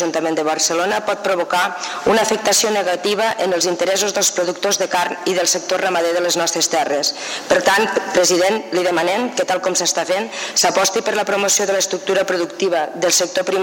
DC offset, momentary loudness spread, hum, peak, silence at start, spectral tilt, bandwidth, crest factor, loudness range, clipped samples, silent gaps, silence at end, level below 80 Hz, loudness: under 0.1%; 5 LU; none; -6 dBFS; 0 s; -1.5 dB/octave; 17 kHz; 12 dB; 1 LU; under 0.1%; none; 0 s; -60 dBFS; -17 LUFS